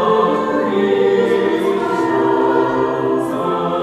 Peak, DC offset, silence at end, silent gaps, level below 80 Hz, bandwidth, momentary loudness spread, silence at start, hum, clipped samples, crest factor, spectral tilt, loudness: -2 dBFS; under 0.1%; 0 s; none; -54 dBFS; 13 kHz; 4 LU; 0 s; none; under 0.1%; 12 dB; -6.5 dB/octave; -16 LUFS